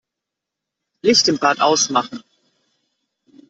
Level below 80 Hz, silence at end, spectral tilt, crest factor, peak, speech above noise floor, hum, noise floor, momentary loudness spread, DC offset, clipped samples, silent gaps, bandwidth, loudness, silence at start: -64 dBFS; 1.3 s; -2 dB/octave; 20 dB; -2 dBFS; 67 dB; none; -83 dBFS; 14 LU; under 0.1%; under 0.1%; none; 8.2 kHz; -16 LUFS; 1.05 s